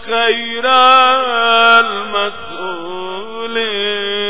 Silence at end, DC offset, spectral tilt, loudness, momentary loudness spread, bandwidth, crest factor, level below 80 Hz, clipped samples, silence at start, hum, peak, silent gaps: 0 s; 3%; -5.5 dB/octave; -12 LUFS; 16 LU; 4 kHz; 14 dB; -58 dBFS; 0.2%; 0 s; none; 0 dBFS; none